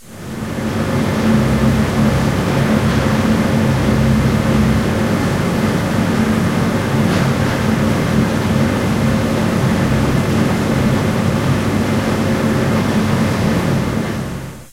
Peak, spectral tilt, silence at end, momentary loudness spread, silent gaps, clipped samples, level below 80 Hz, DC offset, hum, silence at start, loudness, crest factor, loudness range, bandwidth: 0 dBFS; -6.5 dB/octave; 0.05 s; 3 LU; none; under 0.1%; -30 dBFS; under 0.1%; none; 0 s; -16 LUFS; 14 dB; 1 LU; 16 kHz